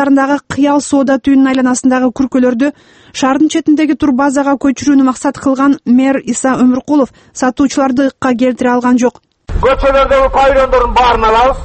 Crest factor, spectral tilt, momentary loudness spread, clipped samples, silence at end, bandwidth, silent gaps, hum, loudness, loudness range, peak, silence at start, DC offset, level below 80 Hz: 10 dB; -4.5 dB/octave; 5 LU; under 0.1%; 0 s; 8.8 kHz; none; none; -11 LUFS; 2 LU; 0 dBFS; 0 s; under 0.1%; -28 dBFS